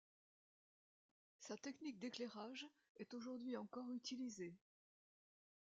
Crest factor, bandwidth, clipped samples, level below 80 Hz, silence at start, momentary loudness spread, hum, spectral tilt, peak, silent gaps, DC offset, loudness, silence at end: 20 dB; 7.8 kHz; under 0.1%; under -90 dBFS; 1.4 s; 8 LU; none; -4 dB/octave; -34 dBFS; 2.89-2.95 s; under 0.1%; -52 LUFS; 1.15 s